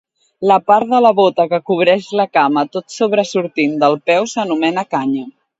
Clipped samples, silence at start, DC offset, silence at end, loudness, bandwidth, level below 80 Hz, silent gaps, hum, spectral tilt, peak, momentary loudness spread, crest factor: under 0.1%; 0.4 s; under 0.1%; 0.3 s; -15 LUFS; 8 kHz; -64 dBFS; none; none; -5 dB/octave; 0 dBFS; 7 LU; 14 dB